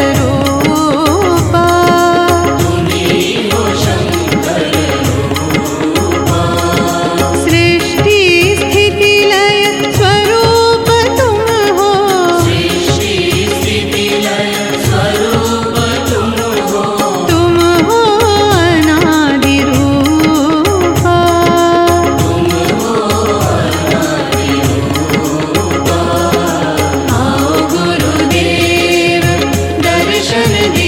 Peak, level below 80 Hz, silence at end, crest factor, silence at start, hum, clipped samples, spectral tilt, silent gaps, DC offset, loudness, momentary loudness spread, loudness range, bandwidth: 0 dBFS; -32 dBFS; 0 s; 10 dB; 0 s; none; under 0.1%; -4.5 dB/octave; none; 0.1%; -10 LUFS; 5 LU; 4 LU; 17 kHz